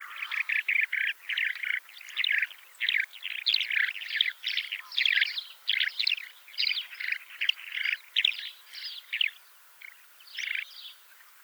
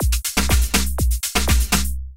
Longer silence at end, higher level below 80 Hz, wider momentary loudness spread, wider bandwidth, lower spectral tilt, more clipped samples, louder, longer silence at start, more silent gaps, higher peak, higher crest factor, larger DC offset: about the same, 0.05 s vs 0 s; second, under -90 dBFS vs -20 dBFS; first, 14 LU vs 3 LU; first, over 20 kHz vs 17 kHz; second, 7 dB/octave vs -3.5 dB/octave; neither; second, -28 LUFS vs -19 LUFS; about the same, 0 s vs 0 s; neither; second, -10 dBFS vs -2 dBFS; about the same, 22 dB vs 18 dB; neither